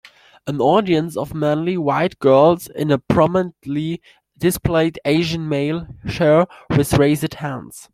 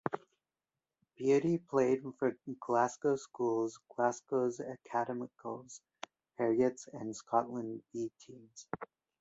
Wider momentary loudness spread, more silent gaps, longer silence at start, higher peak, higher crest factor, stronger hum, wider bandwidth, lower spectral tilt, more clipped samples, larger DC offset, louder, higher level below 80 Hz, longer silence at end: second, 12 LU vs 18 LU; neither; first, 0.45 s vs 0.05 s; first, -2 dBFS vs -14 dBFS; about the same, 16 dB vs 20 dB; neither; first, 16 kHz vs 8 kHz; about the same, -6.5 dB/octave vs -6 dB/octave; neither; neither; first, -18 LUFS vs -35 LUFS; first, -44 dBFS vs -78 dBFS; second, 0.1 s vs 0.35 s